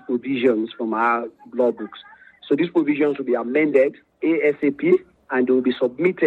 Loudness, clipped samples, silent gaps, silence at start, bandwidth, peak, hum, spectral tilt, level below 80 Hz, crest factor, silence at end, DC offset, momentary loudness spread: -21 LUFS; under 0.1%; none; 0.1 s; 4.5 kHz; -4 dBFS; none; -8 dB/octave; -70 dBFS; 16 dB; 0 s; under 0.1%; 7 LU